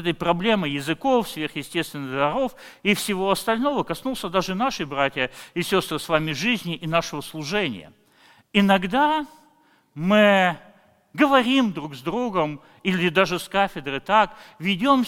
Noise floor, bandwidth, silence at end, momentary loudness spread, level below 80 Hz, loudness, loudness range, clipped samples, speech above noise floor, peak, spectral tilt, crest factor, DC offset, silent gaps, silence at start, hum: -59 dBFS; 17 kHz; 0 s; 10 LU; -52 dBFS; -23 LUFS; 3 LU; under 0.1%; 37 dB; -2 dBFS; -5 dB/octave; 20 dB; under 0.1%; none; 0 s; none